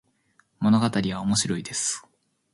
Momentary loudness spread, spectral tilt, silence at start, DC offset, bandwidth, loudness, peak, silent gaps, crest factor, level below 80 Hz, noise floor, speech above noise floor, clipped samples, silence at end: 6 LU; -4 dB/octave; 0.6 s; under 0.1%; 11.5 kHz; -24 LUFS; -10 dBFS; none; 16 dB; -56 dBFS; -65 dBFS; 41 dB; under 0.1%; 0.55 s